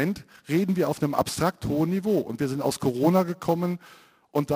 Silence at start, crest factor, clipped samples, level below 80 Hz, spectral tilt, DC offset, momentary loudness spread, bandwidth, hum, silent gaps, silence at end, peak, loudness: 0 s; 18 dB; under 0.1%; -56 dBFS; -6.5 dB/octave; under 0.1%; 7 LU; 16 kHz; none; none; 0 s; -8 dBFS; -26 LUFS